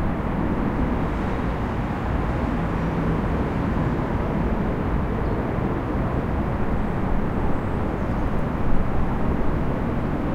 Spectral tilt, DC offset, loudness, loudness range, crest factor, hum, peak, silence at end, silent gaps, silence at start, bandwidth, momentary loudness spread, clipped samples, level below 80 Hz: -9 dB/octave; under 0.1%; -25 LUFS; 1 LU; 16 dB; none; -6 dBFS; 0 s; none; 0 s; 7.4 kHz; 2 LU; under 0.1%; -28 dBFS